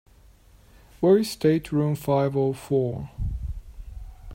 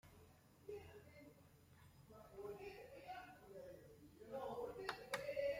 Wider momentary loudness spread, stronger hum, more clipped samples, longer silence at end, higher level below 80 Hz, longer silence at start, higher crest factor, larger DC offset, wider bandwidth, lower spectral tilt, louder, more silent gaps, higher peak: first, 23 LU vs 20 LU; neither; neither; about the same, 0 s vs 0 s; first, -40 dBFS vs -76 dBFS; first, 1 s vs 0.05 s; second, 18 dB vs 24 dB; neither; about the same, 16 kHz vs 16.5 kHz; first, -7.5 dB/octave vs -4 dB/octave; first, -24 LUFS vs -52 LUFS; neither; first, -8 dBFS vs -30 dBFS